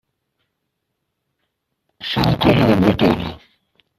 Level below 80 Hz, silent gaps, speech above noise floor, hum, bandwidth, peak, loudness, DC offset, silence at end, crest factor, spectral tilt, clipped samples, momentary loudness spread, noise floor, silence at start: -42 dBFS; none; 60 dB; none; 14.5 kHz; 0 dBFS; -16 LUFS; under 0.1%; 0.6 s; 20 dB; -7.5 dB/octave; under 0.1%; 13 LU; -75 dBFS; 2 s